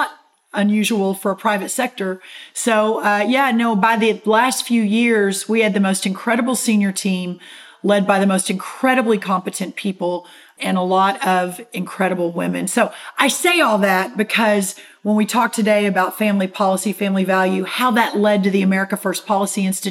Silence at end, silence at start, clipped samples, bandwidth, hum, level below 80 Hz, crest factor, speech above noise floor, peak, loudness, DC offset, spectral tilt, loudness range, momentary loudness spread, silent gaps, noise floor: 0 s; 0 s; under 0.1%; 16.5 kHz; none; -76 dBFS; 16 dB; 20 dB; 0 dBFS; -18 LUFS; under 0.1%; -4.5 dB/octave; 3 LU; 8 LU; none; -37 dBFS